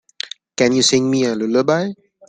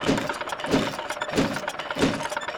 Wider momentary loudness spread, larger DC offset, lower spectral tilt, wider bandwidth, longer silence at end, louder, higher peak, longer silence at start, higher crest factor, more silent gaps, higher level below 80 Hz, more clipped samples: first, 14 LU vs 5 LU; neither; about the same, -4 dB/octave vs -4.5 dB/octave; second, 9.6 kHz vs over 20 kHz; first, 0.35 s vs 0 s; first, -16 LUFS vs -26 LUFS; first, -2 dBFS vs -10 dBFS; first, 0.25 s vs 0 s; about the same, 16 dB vs 18 dB; neither; second, -60 dBFS vs -48 dBFS; neither